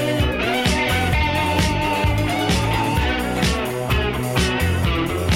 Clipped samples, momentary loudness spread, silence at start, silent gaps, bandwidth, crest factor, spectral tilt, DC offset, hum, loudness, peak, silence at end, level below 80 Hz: under 0.1%; 2 LU; 0 s; none; 17 kHz; 14 dB; -5 dB/octave; 0.3%; none; -20 LUFS; -6 dBFS; 0 s; -28 dBFS